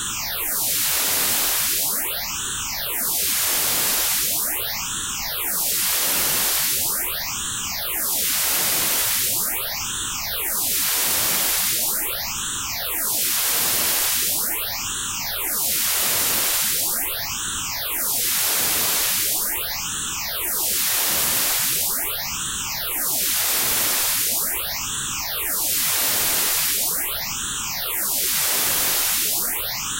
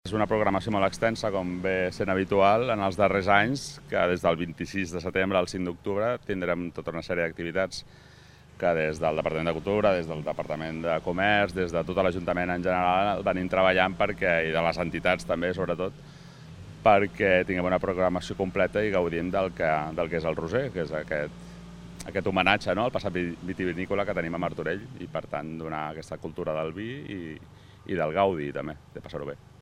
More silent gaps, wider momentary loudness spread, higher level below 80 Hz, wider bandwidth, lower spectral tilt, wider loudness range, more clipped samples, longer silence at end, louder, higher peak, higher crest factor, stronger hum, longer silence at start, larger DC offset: neither; second, 6 LU vs 13 LU; about the same, -48 dBFS vs -52 dBFS; first, 16 kHz vs 14.5 kHz; second, 0.5 dB/octave vs -6 dB/octave; second, 1 LU vs 6 LU; neither; second, 0 s vs 0.25 s; first, -19 LUFS vs -27 LUFS; second, -8 dBFS vs -4 dBFS; second, 14 dB vs 24 dB; neither; about the same, 0 s vs 0.05 s; neither